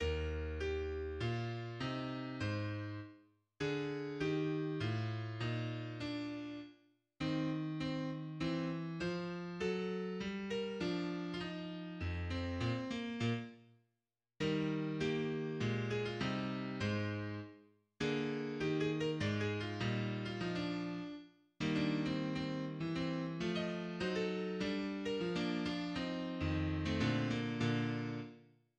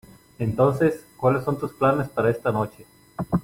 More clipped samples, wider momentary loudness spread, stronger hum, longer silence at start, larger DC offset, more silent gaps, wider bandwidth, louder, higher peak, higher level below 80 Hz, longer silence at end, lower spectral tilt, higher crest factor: neither; second, 7 LU vs 10 LU; neither; second, 0 s vs 0.4 s; neither; neither; second, 9.4 kHz vs 16.5 kHz; second, -39 LUFS vs -23 LUFS; second, -22 dBFS vs -6 dBFS; about the same, -56 dBFS vs -52 dBFS; first, 0.35 s vs 0 s; second, -6.5 dB/octave vs -8.5 dB/octave; about the same, 16 dB vs 16 dB